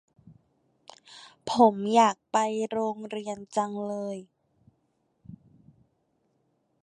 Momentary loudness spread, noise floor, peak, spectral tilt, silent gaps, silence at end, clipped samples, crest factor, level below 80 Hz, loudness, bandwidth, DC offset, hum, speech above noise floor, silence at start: 19 LU; -73 dBFS; -6 dBFS; -4.5 dB/octave; none; 1.5 s; under 0.1%; 22 dB; -72 dBFS; -26 LUFS; 10.5 kHz; under 0.1%; none; 47 dB; 1.1 s